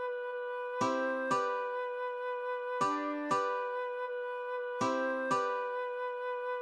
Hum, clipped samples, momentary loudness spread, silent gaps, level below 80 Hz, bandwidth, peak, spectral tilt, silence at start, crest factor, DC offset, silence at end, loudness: none; under 0.1%; 6 LU; none; -86 dBFS; 10.5 kHz; -20 dBFS; -4.5 dB/octave; 0 s; 14 dB; under 0.1%; 0 s; -35 LUFS